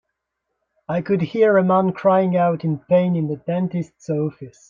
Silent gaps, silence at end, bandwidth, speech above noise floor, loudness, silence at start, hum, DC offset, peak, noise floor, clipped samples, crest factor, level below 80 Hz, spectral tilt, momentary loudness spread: none; 0.2 s; 7.4 kHz; 59 dB; -20 LUFS; 0.9 s; none; under 0.1%; -4 dBFS; -78 dBFS; under 0.1%; 16 dB; -62 dBFS; -9 dB/octave; 10 LU